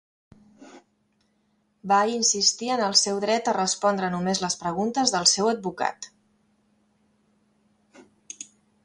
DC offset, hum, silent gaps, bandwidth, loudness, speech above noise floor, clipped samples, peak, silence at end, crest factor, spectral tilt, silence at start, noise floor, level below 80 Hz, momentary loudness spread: under 0.1%; none; none; 11.5 kHz; -23 LUFS; 45 dB; under 0.1%; -4 dBFS; 0.4 s; 24 dB; -2 dB/octave; 0.6 s; -69 dBFS; -68 dBFS; 20 LU